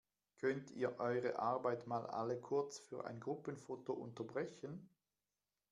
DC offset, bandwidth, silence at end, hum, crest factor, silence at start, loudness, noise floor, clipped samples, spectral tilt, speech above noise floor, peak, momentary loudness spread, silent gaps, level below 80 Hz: under 0.1%; 11 kHz; 0.85 s; none; 18 dB; 0.4 s; -43 LUFS; under -90 dBFS; under 0.1%; -6 dB/octave; over 47 dB; -26 dBFS; 9 LU; none; -86 dBFS